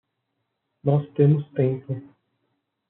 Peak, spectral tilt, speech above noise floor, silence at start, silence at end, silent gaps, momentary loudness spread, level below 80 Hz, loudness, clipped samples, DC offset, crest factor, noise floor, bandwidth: -6 dBFS; -10.5 dB/octave; 56 dB; 0.85 s; 0.85 s; none; 13 LU; -70 dBFS; -23 LUFS; under 0.1%; under 0.1%; 18 dB; -78 dBFS; 3.8 kHz